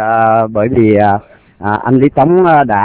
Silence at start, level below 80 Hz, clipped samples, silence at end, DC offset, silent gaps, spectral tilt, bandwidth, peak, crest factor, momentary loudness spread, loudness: 0 s; -40 dBFS; 0.9%; 0 s; under 0.1%; none; -11.5 dB/octave; 4 kHz; 0 dBFS; 10 dB; 9 LU; -10 LUFS